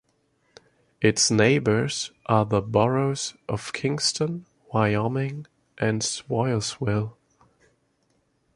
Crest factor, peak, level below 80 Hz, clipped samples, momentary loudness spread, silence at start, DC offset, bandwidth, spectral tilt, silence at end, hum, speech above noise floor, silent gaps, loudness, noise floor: 22 dB; -4 dBFS; -54 dBFS; under 0.1%; 11 LU; 1 s; under 0.1%; 11.5 kHz; -4.5 dB/octave; 1.45 s; none; 45 dB; none; -24 LUFS; -69 dBFS